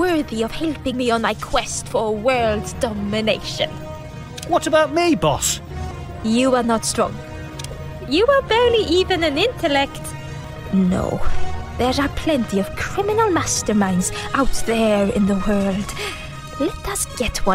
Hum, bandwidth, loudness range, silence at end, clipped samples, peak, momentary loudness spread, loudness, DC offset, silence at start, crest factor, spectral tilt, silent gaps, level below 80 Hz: none; 16 kHz; 3 LU; 0 s; under 0.1%; -2 dBFS; 14 LU; -20 LUFS; under 0.1%; 0 s; 18 dB; -4.5 dB/octave; none; -34 dBFS